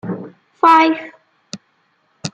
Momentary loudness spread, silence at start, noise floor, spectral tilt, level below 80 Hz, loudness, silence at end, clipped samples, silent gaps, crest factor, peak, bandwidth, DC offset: 25 LU; 0.05 s; -62 dBFS; -5 dB/octave; -68 dBFS; -13 LUFS; 0.05 s; under 0.1%; none; 18 dB; 0 dBFS; 10 kHz; under 0.1%